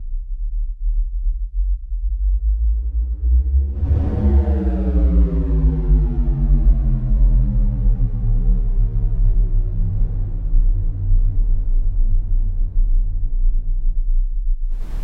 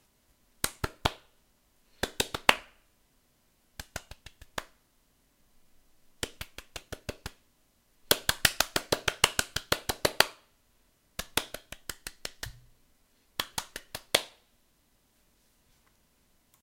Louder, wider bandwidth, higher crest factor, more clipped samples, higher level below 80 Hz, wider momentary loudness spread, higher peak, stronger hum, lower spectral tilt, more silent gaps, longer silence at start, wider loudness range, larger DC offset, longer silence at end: first, -21 LUFS vs -31 LUFS; second, 1.8 kHz vs 17 kHz; second, 12 dB vs 36 dB; neither; first, -16 dBFS vs -52 dBFS; second, 8 LU vs 18 LU; second, -4 dBFS vs 0 dBFS; neither; first, -11.5 dB/octave vs -1.5 dB/octave; neither; second, 0 s vs 0.65 s; second, 5 LU vs 17 LU; neither; second, 0 s vs 2.35 s